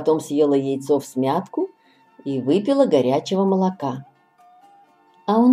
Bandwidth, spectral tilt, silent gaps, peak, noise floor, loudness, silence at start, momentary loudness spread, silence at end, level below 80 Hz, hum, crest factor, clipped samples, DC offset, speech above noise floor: 14.5 kHz; -7 dB/octave; none; -4 dBFS; -54 dBFS; -21 LUFS; 0 s; 12 LU; 0 s; -72 dBFS; none; 16 dB; under 0.1%; under 0.1%; 35 dB